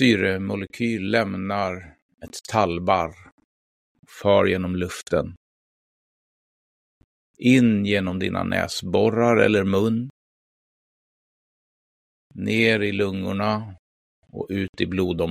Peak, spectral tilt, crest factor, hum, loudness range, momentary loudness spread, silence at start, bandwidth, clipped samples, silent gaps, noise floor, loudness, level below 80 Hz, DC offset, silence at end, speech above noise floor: -4 dBFS; -6 dB/octave; 20 dB; none; 6 LU; 12 LU; 0 s; 15.5 kHz; under 0.1%; 2.02-2.09 s, 3.32-3.38 s, 3.44-4.03 s, 5.37-7.34 s, 10.10-12.30 s, 13.79-14.22 s, 14.69-14.73 s; under -90 dBFS; -22 LUFS; -54 dBFS; under 0.1%; 0 s; over 68 dB